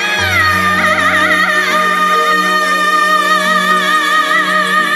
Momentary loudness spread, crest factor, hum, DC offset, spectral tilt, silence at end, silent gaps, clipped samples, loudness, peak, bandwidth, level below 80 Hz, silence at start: 1 LU; 12 dB; none; under 0.1%; -2.5 dB/octave; 0 s; none; under 0.1%; -10 LUFS; 0 dBFS; 16 kHz; -50 dBFS; 0 s